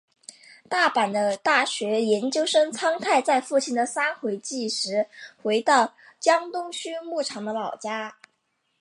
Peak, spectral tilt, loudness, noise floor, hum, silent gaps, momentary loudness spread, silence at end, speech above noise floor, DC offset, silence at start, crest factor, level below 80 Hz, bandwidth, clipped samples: -4 dBFS; -2.5 dB/octave; -24 LUFS; -74 dBFS; none; none; 10 LU; 0.7 s; 50 dB; under 0.1%; 0.7 s; 20 dB; -82 dBFS; 11.5 kHz; under 0.1%